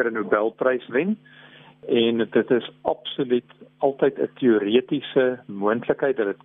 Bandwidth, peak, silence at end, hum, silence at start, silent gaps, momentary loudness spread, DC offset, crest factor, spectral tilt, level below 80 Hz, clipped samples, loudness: 3.9 kHz; -6 dBFS; 0.1 s; none; 0 s; none; 7 LU; under 0.1%; 18 dB; -9.5 dB/octave; -66 dBFS; under 0.1%; -23 LUFS